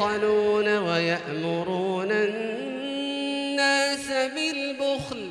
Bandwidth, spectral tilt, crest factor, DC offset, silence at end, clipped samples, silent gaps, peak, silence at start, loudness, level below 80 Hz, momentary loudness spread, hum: 12.5 kHz; -4 dB/octave; 16 dB; under 0.1%; 0 s; under 0.1%; none; -10 dBFS; 0 s; -25 LUFS; -64 dBFS; 8 LU; none